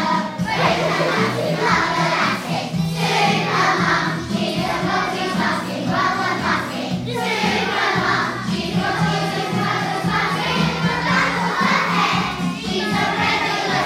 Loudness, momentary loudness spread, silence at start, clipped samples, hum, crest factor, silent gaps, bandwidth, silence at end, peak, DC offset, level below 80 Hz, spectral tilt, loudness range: -19 LUFS; 5 LU; 0 s; under 0.1%; none; 16 dB; none; 16 kHz; 0 s; -4 dBFS; under 0.1%; -46 dBFS; -4.5 dB/octave; 2 LU